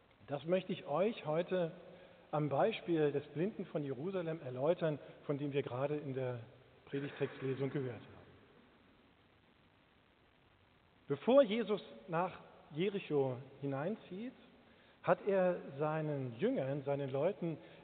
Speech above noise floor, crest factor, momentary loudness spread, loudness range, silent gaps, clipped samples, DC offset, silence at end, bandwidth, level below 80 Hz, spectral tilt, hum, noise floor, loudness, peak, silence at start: 32 dB; 22 dB; 11 LU; 8 LU; none; under 0.1%; under 0.1%; 0 s; 4.5 kHz; -78 dBFS; -6 dB/octave; none; -69 dBFS; -38 LUFS; -16 dBFS; 0.3 s